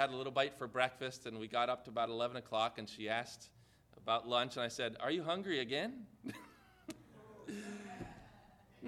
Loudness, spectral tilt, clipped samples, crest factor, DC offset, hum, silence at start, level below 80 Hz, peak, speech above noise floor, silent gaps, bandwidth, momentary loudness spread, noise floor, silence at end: -39 LUFS; -4 dB/octave; under 0.1%; 24 dB; under 0.1%; none; 0 s; -74 dBFS; -16 dBFS; 24 dB; none; 14.5 kHz; 17 LU; -63 dBFS; 0 s